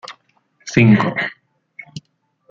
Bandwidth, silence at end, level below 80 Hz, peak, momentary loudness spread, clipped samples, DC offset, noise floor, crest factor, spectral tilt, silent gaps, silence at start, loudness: 7.6 kHz; 0.5 s; -52 dBFS; -2 dBFS; 25 LU; under 0.1%; under 0.1%; -63 dBFS; 18 dB; -6.5 dB/octave; none; 0.05 s; -15 LUFS